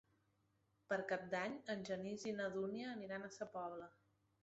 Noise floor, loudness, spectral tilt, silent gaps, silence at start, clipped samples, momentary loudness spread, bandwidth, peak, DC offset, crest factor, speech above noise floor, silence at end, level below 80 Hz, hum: -81 dBFS; -46 LUFS; -4 dB/octave; none; 0.9 s; under 0.1%; 7 LU; 8 kHz; -28 dBFS; under 0.1%; 18 dB; 36 dB; 0.5 s; -82 dBFS; none